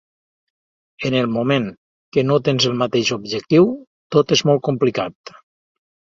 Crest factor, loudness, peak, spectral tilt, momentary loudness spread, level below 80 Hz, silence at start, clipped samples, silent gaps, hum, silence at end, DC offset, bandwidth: 18 dB; -18 LUFS; -2 dBFS; -5.5 dB/octave; 10 LU; -58 dBFS; 1 s; under 0.1%; 1.77-2.12 s, 3.87-4.10 s; none; 1 s; under 0.1%; 7.8 kHz